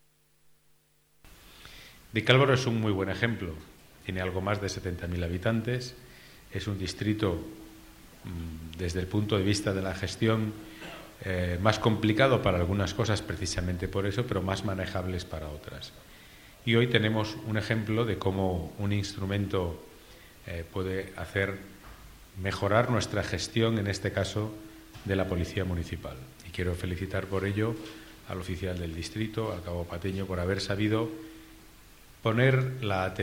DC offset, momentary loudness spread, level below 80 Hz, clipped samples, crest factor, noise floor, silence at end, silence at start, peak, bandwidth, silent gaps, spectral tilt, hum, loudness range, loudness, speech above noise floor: under 0.1%; 19 LU; -50 dBFS; under 0.1%; 24 dB; -66 dBFS; 0 s; 1.25 s; -6 dBFS; 16.5 kHz; none; -6 dB/octave; none; 6 LU; -30 LUFS; 37 dB